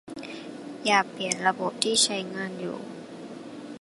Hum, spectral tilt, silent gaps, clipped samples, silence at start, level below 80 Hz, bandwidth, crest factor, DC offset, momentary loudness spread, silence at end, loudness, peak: none; -2 dB/octave; none; under 0.1%; 0.05 s; -74 dBFS; 11.5 kHz; 22 dB; under 0.1%; 19 LU; 0 s; -25 LUFS; -6 dBFS